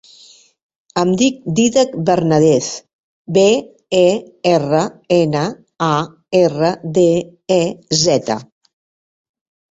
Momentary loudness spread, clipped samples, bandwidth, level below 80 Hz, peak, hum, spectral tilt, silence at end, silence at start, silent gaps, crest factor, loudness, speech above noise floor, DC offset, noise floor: 7 LU; under 0.1%; 8 kHz; -54 dBFS; 0 dBFS; none; -5 dB/octave; 1.3 s; 0.95 s; 2.93-3.25 s; 16 dB; -16 LUFS; 32 dB; under 0.1%; -46 dBFS